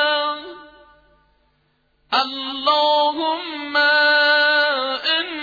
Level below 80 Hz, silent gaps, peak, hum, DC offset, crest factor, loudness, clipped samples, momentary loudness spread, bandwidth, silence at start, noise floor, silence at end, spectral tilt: -64 dBFS; none; -6 dBFS; none; under 0.1%; 14 dB; -17 LUFS; under 0.1%; 10 LU; 5 kHz; 0 s; -64 dBFS; 0 s; -2 dB/octave